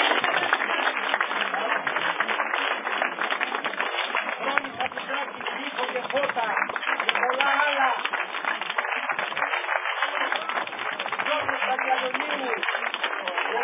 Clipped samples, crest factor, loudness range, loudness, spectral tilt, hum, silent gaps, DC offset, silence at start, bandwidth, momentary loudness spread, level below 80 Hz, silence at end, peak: under 0.1%; 24 dB; 3 LU; -25 LUFS; 1.5 dB/octave; none; none; under 0.1%; 0 s; 3.9 kHz; 6 LU; -76 dBFS; 0 s; -2 dBFS